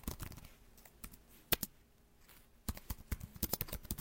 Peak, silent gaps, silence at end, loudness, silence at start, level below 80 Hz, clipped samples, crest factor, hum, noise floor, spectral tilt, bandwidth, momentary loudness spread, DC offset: -12 dBFS; none; 0 s; -41 LUFS; 0 s; -52 dBFS; under 0.1%; 32 dB; none; -66 dBFS; -3 dB/octave; 17 kHz; 24 LU; under 0.1%